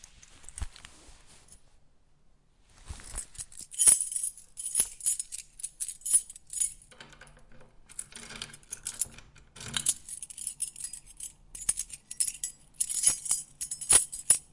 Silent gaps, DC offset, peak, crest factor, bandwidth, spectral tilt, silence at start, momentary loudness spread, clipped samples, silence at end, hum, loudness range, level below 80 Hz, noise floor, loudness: none; under 0.1%; -4 dBFS; 28 dB; 11.5 kHz; 0.5 dB/octave; 0.4 s; 21 LU; under 0.1%; 0.1 s; none; 11 LU; -54 dBFS; -61 dBFS; -27 LUFS